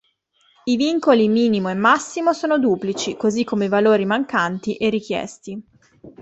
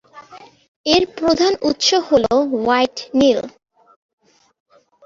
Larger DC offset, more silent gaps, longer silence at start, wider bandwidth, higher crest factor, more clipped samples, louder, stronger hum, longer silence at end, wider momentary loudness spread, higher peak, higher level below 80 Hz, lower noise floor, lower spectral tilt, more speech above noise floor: neither; second, none vs 0.68-0.84 s; first, 0.65 s vs 0.15 s; about the same, 8.2 kHz vs 7.8 kHz; about the same, 16 dB vs 18 dB; neither; second, -19 LUFS vs -16 LUFS; neither; second, 0 s vs 1.55 s; first, 11 LU vs 4 LU; about the same, -2 dBFS vs -2 dBFS; second, -60 dBFS vs -50 dBFS; first, -62 dBFS vs -42 dBFS; first, -5 dB/octave vs -3 dB/octave; first, 43 dB vs 26 dB